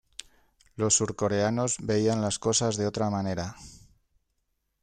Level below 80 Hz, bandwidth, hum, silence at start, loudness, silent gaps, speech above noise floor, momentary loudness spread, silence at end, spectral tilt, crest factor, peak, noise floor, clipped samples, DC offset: -58 dBFS; 9.8 kHz; none; 0.8 s; -27 LUFS; none; 50 dB; 14 LU; 1.05 s; -4 dB/octave; 20 dB; -10 dBFS; -77 dBFS; under 0.1%; under 0.1%